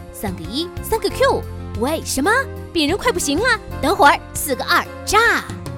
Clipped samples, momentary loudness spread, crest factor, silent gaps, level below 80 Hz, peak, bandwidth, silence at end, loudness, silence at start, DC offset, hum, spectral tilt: under 0.1%; 11 LU; 16 dB; none; -36 dBFS; -2 dBFS; 18 kHz; 0 s; -18 LUFS; 0 s; under 0.1%; none; -3.5 dB/octave